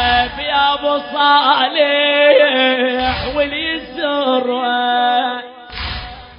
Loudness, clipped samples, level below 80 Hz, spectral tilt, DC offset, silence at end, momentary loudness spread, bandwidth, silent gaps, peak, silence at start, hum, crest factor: -14 LUFS; under 0.1%; -38 dBFS; -9 dB/octave; under 0.1%; 0 s; 13 LU; 5.4 kHz; none; 0 dBFS; 0 s; none; 16 dB